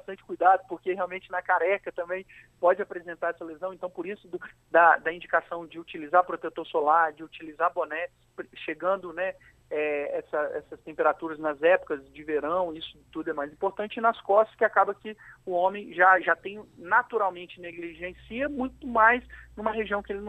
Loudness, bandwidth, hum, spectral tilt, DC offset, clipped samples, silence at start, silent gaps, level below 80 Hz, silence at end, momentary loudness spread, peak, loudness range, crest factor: -27 LUFS; 8.4 kHz; none; -6 dB/octave; under 0.1%; under 0.1%; 0.1 s; none; -60 dBFS; 0 s; 17 LU; -6 dBFS; 5 LU; 22 dB